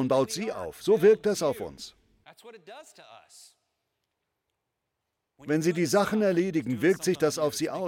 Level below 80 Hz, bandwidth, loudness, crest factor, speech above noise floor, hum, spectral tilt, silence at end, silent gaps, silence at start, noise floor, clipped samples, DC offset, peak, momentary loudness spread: -66 dBFS; 17 kHz; -26 LUFS; 18 dB; 56 dB; none; -5 dB/octave; 0 s; none; 0 s; -83 dBFS; under 0.1%; under 0.1%; -10 dBFS; 22 LU